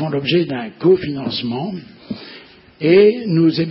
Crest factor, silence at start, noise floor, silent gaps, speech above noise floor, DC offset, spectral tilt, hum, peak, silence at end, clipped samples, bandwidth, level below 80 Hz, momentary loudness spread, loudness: 16 dB; 0 s; -42 dBFS; none; 26 dB; under 0.1%; -11.5 dB/octave; none; 0 dBFS; 0 s; under 0.1%; 5.8 kHz; -56 dBFS; 20 LU; -16 LUFS